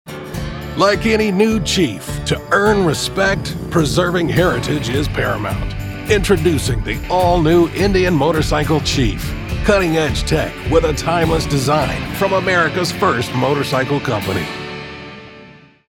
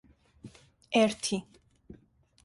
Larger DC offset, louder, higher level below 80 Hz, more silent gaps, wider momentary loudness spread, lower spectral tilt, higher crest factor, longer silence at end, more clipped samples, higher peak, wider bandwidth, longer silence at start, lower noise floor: neither; first, -16 LUFS vs -29 LUFS; first, -28 dBFS vs -66 dBFS; neither; second, 10 LU vs 26 LU; about the same, -5 dB/octave vs -4 dB/octave; second, 16 dB vs 22 dB; second, 0.35 s vs 0.5 s; neither; first, 0 dBFS vs -12 dBFS; first, 18 kHz vs 11.5 kHz; second, 0.05 s vs 0.45 s; second, -42 dBFS vs -62 dBFS